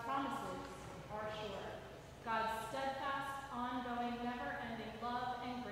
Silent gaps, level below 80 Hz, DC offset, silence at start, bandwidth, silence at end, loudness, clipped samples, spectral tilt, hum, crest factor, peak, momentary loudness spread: none; -64 dBFS; under 0.1%; 0 s; 16 kHz; 0 s; -43 LUFS; under 0.1%; -4.5 dB/octave; none; 18 dB; -26 dBFS; 9 LU